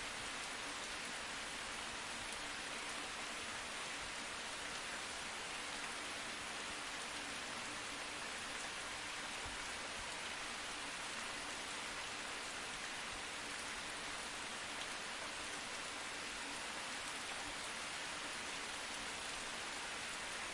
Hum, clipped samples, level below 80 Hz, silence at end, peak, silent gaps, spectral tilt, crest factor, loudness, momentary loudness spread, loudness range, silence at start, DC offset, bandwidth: none; under 0.1%; -68 dBFS; 0 s; -28 dBFS; none; -0.5 dB/octave; 18 dB; -44 LUFS; 1 LU; 0 LU; 0 s; under 0.1%; 11.5 kHz